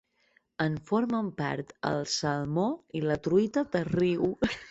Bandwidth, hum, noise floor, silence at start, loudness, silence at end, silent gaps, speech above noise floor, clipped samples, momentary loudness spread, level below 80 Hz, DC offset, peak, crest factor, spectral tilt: 8.2 kHz; none; -69 dBFS; 0.6 s; -29 LUFS; 0 s; none; 40 dB; under 0.1%; 6 LU; -58 dBFS; under 0.1%; -12 dBFS; 18 dB; -5.5 dB/octave